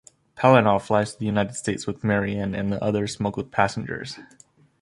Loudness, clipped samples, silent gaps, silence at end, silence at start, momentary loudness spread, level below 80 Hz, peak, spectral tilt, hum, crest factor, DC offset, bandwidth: -23 LUFS; under 0.1%; none; 0.55 s; 0.35 s; 13 LU; -52 dBFS; -2 dBFS; -6 dB/octave; none; 22 dB; under 0.1%; 11.5 kHz